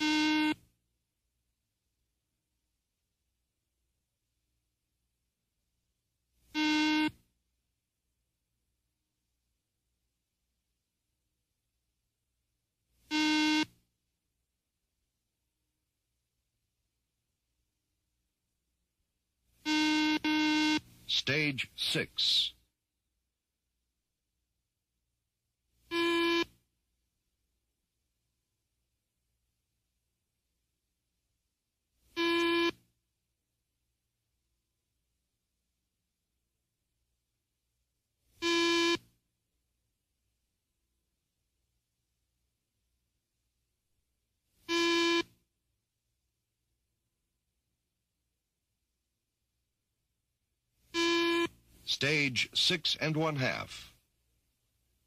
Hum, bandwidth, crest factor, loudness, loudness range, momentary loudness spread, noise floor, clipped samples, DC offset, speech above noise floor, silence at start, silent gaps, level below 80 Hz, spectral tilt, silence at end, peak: none; 15 kHz; 22 dB; -30 LUFS; 9 LU; 10 LU; -86 dBFS; under 0.1%; under 0.1%; 54 dB; 0 s; none; -72 dBFS; -3.5 dB/octave; 1.2 s; -16 dBFS